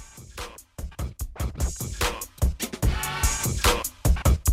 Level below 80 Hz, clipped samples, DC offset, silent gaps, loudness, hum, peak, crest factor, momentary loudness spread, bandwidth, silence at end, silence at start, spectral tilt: -28 dBFS; under 0.1%; under 0.1%; none; -26 LUFS; none; -8 dBFS; 18 dB; 16 LU; 16 kHz; 0 s; 0 s; -3.5 dB/octave